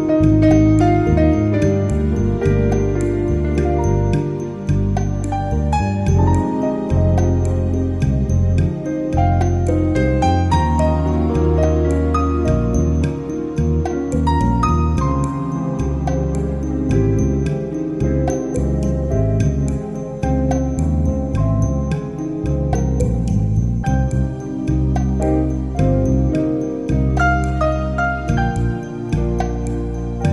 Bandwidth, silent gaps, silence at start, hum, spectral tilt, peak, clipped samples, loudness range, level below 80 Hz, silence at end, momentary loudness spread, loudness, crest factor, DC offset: 11.5 kHz; none; 0 s; none; -8.5 dB/octave; -2 dBFS; under 0.1%; 3 LU; -24 dBFS; 0 s; 6 LU; -18 LUFS; 14 dB; 0.2%